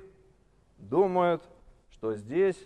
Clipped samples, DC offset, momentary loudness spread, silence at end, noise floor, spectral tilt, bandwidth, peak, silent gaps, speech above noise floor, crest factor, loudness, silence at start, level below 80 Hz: under 0.1%; under 0.1%; 11 LU; 0.05 s; -63 dBFS; -7.5 dB/octave; 9.8 kHz; -12 dBFS; none; 36 dB; 18 dB; -28 LUFS; 0 s; -62 dBFS